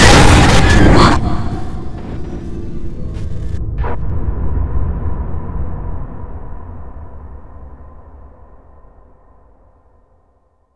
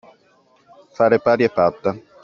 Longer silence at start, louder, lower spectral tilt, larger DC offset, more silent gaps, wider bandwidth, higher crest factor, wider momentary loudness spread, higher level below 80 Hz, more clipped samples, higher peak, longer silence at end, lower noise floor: second, 0 s vs 1 s; first, -15 LUFS vs -18 LUFS; about the same, -5 dB/octave vs -5 dB/octave; neither; neither; first, 11 kHz vs 6.8 kHz; about the same, 14 dB vs 18 dB; first, 25 LU vs 9 LU; first, -20 dBFS vs -58 dBFS; first, 0.3% vs under 0.1%; about the same, 0 dBFS vs -2 dBFS; second, 0 s vs 0.25 s; about the same, -57 dBFS vs -57 dBFS